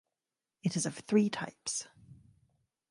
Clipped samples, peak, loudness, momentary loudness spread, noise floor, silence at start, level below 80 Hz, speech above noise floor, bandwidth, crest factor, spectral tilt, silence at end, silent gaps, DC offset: under 0.1%; -16 dBFS; -33 LUFS; 9 LU; under -90 dBFS; 0.65 s; -74 dBFS; over 58 dB; 11.5 kHz; 20 dB; -4.5 dB/octave; 0.75 s; none; under 0.1%